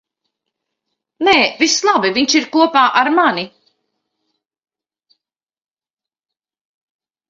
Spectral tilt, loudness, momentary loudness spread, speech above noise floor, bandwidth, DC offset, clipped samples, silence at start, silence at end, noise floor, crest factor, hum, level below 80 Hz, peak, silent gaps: -2 dB/octave; -13 LUFS; 6 LU; over 76 dB; 7.8 kHz; under 0.1%; under 0.1%; 1.2 s; 3.8 s; under -90 dBFS; 18 dB; none; -62 dBFS; 0 dBFS; none